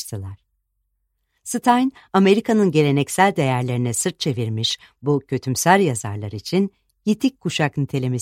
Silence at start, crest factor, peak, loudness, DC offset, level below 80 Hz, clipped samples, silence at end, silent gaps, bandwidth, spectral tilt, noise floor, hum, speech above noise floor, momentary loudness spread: 0 s; 20 dB; 0 dBFS; -20 LUFS; under 0.1%; -58 dBFS; under 0.1%; 0 s; none; 16.5 kHz; -5 dB/octave; -72 dBFS; none; 53 dB; 12 LU